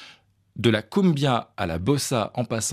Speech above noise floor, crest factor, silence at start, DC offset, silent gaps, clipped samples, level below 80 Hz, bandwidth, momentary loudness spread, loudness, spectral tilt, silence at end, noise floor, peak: 31 dB; 18 dB; 0 s; under 0.1%; none; under 0.1%; -56 dBFS; 15.5 kHz; 6 LU; -24 LUFS; -5 dB/octave; 0 s; -54 dBFS; -6 dBFS